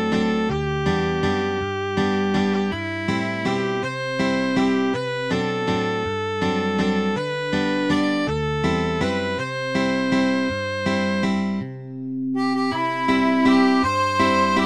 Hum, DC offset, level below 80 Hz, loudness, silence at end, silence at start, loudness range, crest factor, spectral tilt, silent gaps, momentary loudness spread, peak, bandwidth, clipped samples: none; 0.2%; -46 dBFS; -22 LUFS; 0 s; 0 s; 2 LU; 16 dB; -6 dB/octave; none; 7 LU; -6 dBFS; 11.5 kHz; under 0.1%